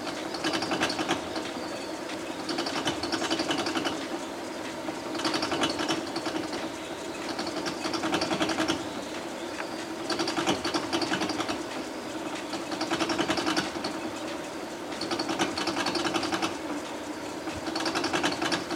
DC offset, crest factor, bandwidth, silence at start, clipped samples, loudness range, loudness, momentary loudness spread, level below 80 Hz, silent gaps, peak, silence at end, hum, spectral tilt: under 0.1%; 20 dB; 16 kHz; 0 s; under 0.1%; 1 LU; -30 LUFS; 8 LU; -60 dBFS; none; -10 dBFS; 0 s; none; -3 dB/octave